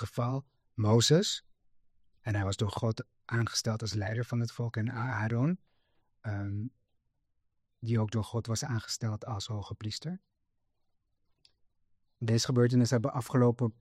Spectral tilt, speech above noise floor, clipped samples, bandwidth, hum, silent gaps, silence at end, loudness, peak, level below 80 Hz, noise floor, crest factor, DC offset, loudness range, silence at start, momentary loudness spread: -5.5 dB/octave; 47 dB; under 0.1%; 14 kHz; none; none; 0.1 s; -31 LUFS; -12 dBFS; -64 dBFS; -77 dBFS; 20 dB; under 0.1%; 7 LU; 0 s; 14 LU